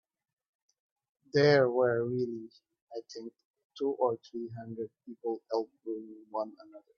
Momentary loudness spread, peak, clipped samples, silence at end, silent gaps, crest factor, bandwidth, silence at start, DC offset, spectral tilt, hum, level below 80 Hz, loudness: 21 LU; -12 dBFS; under 0.1%; 0.2 s; 2.82-2.87 s, 3.45-3.54 s, 3.65-3.70 s; 22 dB; 7 kHz; 1.35 s; under 0.1%; -6.5 dB/octave; none; -76 dBFS; -32 LUFS